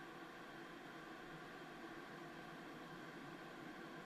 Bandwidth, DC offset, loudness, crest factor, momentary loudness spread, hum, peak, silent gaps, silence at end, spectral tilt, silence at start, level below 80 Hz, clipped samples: 13.5 kHz; under 0.1%; -54 LUFS; 14 dB; 1 LU; none; -40 dBFS; none; 0 s; -5 dB/octave; 0 s; -78 dBFS; under 0.1%